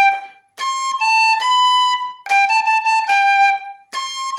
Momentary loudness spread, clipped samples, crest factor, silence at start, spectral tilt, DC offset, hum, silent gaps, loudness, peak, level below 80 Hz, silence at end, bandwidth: 12 LU; under 0.1%; 12 dB; 0 s; 4 dB/octave; under 0.1%; none; none; -15 LUFS; -4 dBFS; -80 dBFS; 0 s; 12.5 kHz